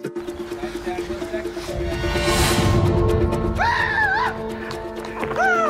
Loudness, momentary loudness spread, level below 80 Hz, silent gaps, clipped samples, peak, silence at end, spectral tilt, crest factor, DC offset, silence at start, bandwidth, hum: -22 LUFS; 12 LU; -32 dBFS; none; under 0.1%; -6 dBFS; 0 s; -5 dB/octave; 14 dB; under 0.1%; 0 s; 16 kHz; none